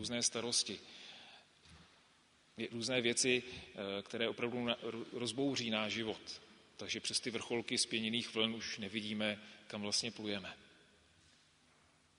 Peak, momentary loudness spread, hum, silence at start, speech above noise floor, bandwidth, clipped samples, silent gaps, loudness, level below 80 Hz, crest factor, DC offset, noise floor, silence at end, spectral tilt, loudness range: -18 dBFS; 16 LU; none; 0 s; 31 dB; 10.5 kHz; under 0.1%; none; -38 LUFS; -76 dBFS; 22 dB; under 0.1%; -70 dBFS; 1.55 s; -2.5 dB/octave; 3 LU